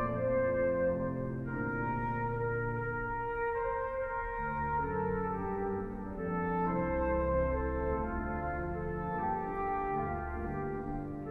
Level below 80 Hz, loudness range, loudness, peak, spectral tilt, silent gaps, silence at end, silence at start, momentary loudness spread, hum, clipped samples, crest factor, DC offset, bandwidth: -44 dBFS; 2 LU; -35 LUFS; -20 dBFS; -10.5 dB/octave; none; 0 s; 0 s; 6 LU; none; under 0.1%; 14 dB; under 0.1%; 4.2 kHz